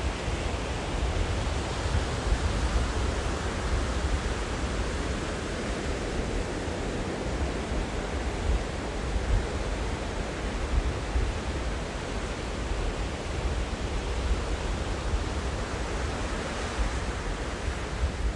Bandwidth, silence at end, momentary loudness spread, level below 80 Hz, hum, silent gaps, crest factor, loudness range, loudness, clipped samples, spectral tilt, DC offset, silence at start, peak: 11.5 kHz; 0 s; 3 LU; -32 dBFS; none; none; 16 dB; 2 LU; -31 LUFS; under 0.1%; -5 dB/octave; under 0.1%; 0 s; -12 dBFS